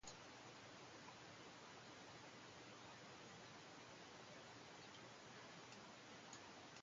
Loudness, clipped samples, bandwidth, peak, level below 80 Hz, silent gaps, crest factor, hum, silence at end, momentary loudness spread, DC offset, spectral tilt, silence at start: -59 LUFS; under 0.1%; 8.8 kHz; -42 dBFS; -84 dBFS; none; 18 dB; none; 0 s; 1 LU; under 0.1%; -3 dB/octave; 0 s